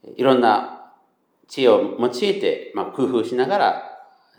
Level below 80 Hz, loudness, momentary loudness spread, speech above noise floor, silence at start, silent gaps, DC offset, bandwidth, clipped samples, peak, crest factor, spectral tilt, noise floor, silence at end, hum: -82 dBFS; -20 LUFS; 13 LU; 43 dB; 0.05 s; none; under 0.1%; 15 kHz; under 0.1%; -2 dBFS; 18 dB; -5.5 dB/octave; -62 dBFS; 0.4 s; none